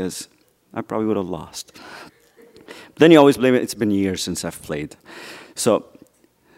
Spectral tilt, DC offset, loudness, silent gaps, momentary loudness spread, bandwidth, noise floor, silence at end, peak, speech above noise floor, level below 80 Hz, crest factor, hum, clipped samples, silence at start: -5 dB/octave; under 0.1%; -19 LUFS; none; 26 LU; 16 kHz; -57 dBFS; 0.75 s; 0 dBFS; 39 dB; -56 dBFS; 20 dB; none; under 0.1%; 0 s